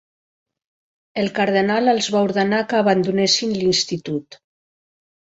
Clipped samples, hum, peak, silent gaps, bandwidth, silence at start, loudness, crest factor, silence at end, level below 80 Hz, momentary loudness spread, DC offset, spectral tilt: under 0.1%; none; -2 dBFS; none; 8 kHz; 1.15 s; -19 LUFS; 18 dB; 1 s; -60 dBFS; 9 LU; under 0.1%; -4 dB/octave